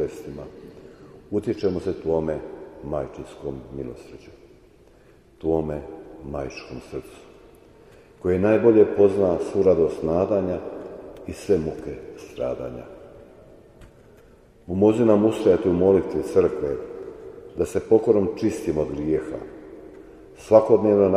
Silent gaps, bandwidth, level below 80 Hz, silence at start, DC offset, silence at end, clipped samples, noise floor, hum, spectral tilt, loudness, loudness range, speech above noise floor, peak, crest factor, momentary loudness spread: none; 12.5 kHz; -48 dBFS; 0 s; under 0.1%; 0 s; under 0.1%; -53 dBFS; none; -8 dB/octave; -22 LUFS; 12 LU; 31 dB; -2 dBFS; 22 dB; 21 LU